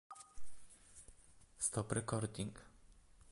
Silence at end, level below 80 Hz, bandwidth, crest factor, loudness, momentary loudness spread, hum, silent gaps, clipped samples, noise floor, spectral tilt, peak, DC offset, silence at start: 0 s; -64 dBFS; 11.5 kHz; 20 dB; -41 LUFS; 23 LU; none; none; under 0.1%; -64 dBFS; -4.5 dB/octave; -24 dBFS; under 0.1%; 0.1 s